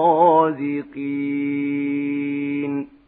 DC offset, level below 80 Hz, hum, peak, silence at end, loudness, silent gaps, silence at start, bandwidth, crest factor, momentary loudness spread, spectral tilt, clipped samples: under 0.1%; -70 dBFS; none; -4 dBFS; 0.2 s; -21 LUFS; none; 0 s; 4 kHz; 16 dB; 11 LU; -11 dB/octave; under 0.1%